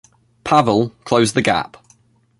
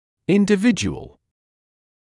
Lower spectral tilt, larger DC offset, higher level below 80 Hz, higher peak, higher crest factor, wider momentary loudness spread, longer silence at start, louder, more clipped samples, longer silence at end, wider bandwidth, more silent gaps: about the same, -5 dB/octave vs -5.5 dB/octave; neither; about the same, -52 dBFS vs -52 dBFS; first, 0 dBFS vs -4 dBFS; about the same, 18 dB vs 18 dB; about the same, 12 LU vs 11 LU; first, 0.45 s vs 0.3 s; about the same, -17 LUFS vs -19 LUFS; neither; second, 0.75 s vs 1.1 s; about the same, 11.5 kHz vs 11.5 kHz; neither